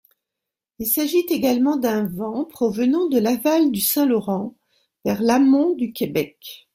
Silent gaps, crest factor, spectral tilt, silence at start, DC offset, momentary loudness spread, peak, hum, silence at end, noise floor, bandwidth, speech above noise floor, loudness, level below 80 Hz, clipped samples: none; 16 dB; -5 dB/octave; 0.8 s; under 0.1%; 10 LU; -6 dBFS; none; 0.2 s; -85 dBFS; 16.5 kHz; 66 dB; -20 LUFS; -60 dBFS; under 0.1%